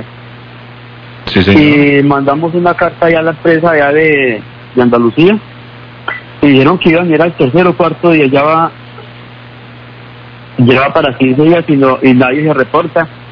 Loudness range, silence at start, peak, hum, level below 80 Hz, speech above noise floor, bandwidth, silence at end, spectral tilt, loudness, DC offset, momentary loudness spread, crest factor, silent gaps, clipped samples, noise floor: 3 LU; 0 s; 0 dBFS; 60 Hz at -35 dBFS; -42 dBFS; 23 dB; 5.4 kHz; 0 s; -9 dB/octave; -9 LUFS; under 0.1%; 9 LU; 10 dB; none; 2%; -31 dBFS